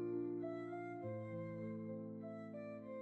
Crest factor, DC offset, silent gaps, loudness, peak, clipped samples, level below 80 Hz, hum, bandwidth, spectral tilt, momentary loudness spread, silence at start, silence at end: 12 dB; under 0.1%; none; -47 LUFS; -34 dBFS; under 0.1%; -82 dBFS; none; 7.6 kHz; -9 dB/octave; 7 LU; 0 s; 0 s